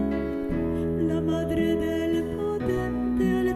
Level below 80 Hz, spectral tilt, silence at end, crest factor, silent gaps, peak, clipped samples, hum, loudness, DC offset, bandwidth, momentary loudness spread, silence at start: -40 dBFS; -7.5 dB/octave; 0 s; 12 dB; none; -12 dBFS; under 0.1%; none; -26 LUFS; under 0.1%; 13.5 kHz; 4 LU; 0 s